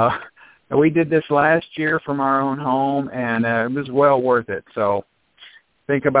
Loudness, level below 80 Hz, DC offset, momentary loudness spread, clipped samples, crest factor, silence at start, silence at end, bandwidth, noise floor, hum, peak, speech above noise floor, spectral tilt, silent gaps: -19 LUFS; -56 dBFS; under 0.1%; 6 LU; under 0.1%; 18 dB; 0 s; 0 s; 4 kHz; -48 dBFS; none; -2 dBFS; 29 dB; -10.5 dB/octave; none